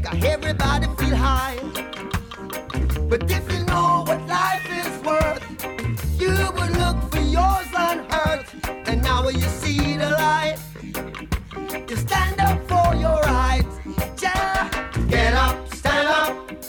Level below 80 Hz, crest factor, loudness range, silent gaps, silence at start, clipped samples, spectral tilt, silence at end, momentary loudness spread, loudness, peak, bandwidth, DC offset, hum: -28 dBFS; 14 dB; 2 LU; none; 0 s; under 0.1%; -5 dB/octave; 0 s; 10 LU; -22 LUFS; -8 dBFS; 19 kHz; under 0.1%; none